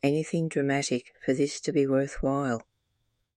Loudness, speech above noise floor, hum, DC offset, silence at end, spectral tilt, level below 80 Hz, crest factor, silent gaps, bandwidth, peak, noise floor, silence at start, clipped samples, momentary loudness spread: -28 LUFS; 49 dB; none; under 0.1%; 0.75 s; -5.5 dB/octave; -50 dBFS; 16 dB; none; 11.5 kHz; -12 dBFS; -76 dBFS; 0.05 s; under 0.1%; 5 LU